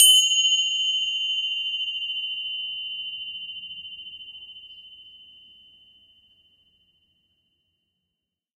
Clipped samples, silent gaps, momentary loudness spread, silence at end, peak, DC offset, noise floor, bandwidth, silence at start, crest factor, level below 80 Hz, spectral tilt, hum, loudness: under 0.1%; none; 23 LU; 3.35 s; -2 dBFS; under 0.1%; -83 dBFS; 14 kHz; 0 s; 26 dB; -72 dBFS; 6 dB/octave; none; -22 LUFS